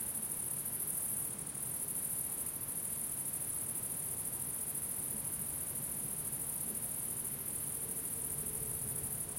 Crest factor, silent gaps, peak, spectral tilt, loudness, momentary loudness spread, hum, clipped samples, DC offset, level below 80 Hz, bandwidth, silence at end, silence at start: 16 dB; none; -24 dBFS; -2.5 dB/octave; -36 LUFS; 2 LU; none; under 0.1%; under 0.1%; -64 dBFS; 16.5 kHz; 0 s; 0 s